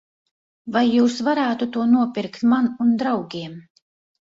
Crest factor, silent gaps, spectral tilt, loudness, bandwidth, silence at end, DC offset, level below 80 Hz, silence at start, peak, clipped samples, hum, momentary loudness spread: 14 dB; none; -5.5 dB/octave; -20 LUFS; 7.6 kHz; 0.6 s; under 0.1%; -64 dBFS; 0.65 s; -6 dBFS; under 0.1%; none; 13 LU